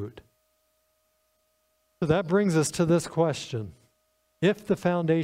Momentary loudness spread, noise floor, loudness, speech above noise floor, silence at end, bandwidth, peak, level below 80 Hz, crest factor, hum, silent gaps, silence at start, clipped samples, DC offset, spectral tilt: 12 LU; -72 dBFS; -26 LUFS; 47 dB; 0 s; 15 kHz; -10 dBFS; -60 dBFS; 18 dB; none; none; 0 s; under 0.1%; under 0.1%; -6 dB/octave